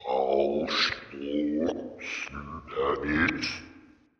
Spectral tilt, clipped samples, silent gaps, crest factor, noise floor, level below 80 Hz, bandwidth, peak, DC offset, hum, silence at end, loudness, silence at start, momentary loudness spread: -4.5 dB/octave; under 0.1%; none; 18 dB; -55 dBFS; -52 dBFS; 8.2 kHz; -12 dBFS; under 0.1%; none; 0.4 s; -29 LUFS; 0 s; 11 LU